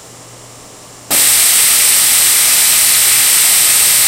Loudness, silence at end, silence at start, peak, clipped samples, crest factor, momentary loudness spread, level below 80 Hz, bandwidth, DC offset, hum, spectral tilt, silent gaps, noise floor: -6 LUFS; 0 s; 0.3 s; 0 dBFS; 0.2%; 10 dB; 1 LU; -48 dBFS; over 20 kHz; under 0.1%; none; 2 dB/octave; none; -35 dBFS